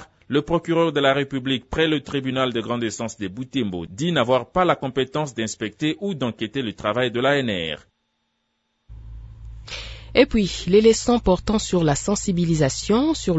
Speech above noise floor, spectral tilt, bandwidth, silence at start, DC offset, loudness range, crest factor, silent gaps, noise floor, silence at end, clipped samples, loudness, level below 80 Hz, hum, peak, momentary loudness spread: 51 dB; -5 dB/octave; 8 kHz; 0 s; under 0.1%; 6 LU; 20 dB; none; -73 dBFS; 0 s; under 0.1%; -22 LUFS; -42 dBFS; none; -2 dBFS; 11 LU